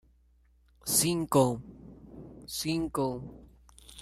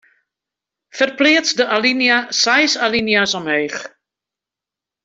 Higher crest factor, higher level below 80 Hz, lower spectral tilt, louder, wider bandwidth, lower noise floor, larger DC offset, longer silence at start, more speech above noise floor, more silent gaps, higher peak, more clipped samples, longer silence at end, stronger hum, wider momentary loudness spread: first, 22 dB vs 16 dB; about the same, -56 dBFS vs -58 dBFS; first, -4 dB/octave vs -2 dB/octave; second, -29 LUFS vs -15 LUFS; first, 16 kHz vs 8 kHz; second, -64 dBFS vs -87 dBFS; neither; about the same, 0.85 s vs 0.95 s; second, 35 dB vs 71 dB; neither; second, -12 dBFS vs -2 dBFS; neither; second, 0 s vs 1.15 s; neither; first, 24 LU vs 7 LU